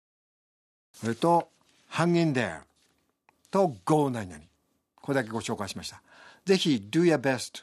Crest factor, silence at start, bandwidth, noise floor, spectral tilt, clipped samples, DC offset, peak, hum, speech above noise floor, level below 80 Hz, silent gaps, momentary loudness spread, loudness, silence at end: 20 dB; 1 s; 14 kHz; -70 dBFS; -5.5 dB/octave; under 0.1%; under 0.1%; -8 dBFS; none; 44 dB; -70 dBFS; none; 15 LU; -27 LUFS; 0 s